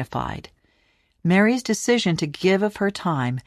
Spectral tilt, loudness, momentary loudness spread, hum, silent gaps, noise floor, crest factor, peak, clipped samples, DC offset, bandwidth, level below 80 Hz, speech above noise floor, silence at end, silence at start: -5.5 dB/octave; -22 LUFS; 10 LU; none; none; -64 dBFS; 16 dB; -6 dBFS; under 0.1%; under 0.1%; 14 kHz; -52 dBFS; 43 dB; 0.05 s; 0 s